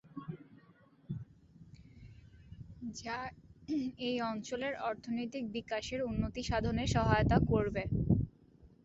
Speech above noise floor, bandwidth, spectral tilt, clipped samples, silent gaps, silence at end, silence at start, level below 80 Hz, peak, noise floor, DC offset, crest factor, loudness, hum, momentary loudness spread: 30 dB; 8.2 kHz; -6.5 dB/octave; under 0.1%; none; 0.2 s; 0.15 s; -48 dBFS; -14 dBFS; -64 dBFS; under 0.1%; 22 dB; -35 LUFS; none; 23 LU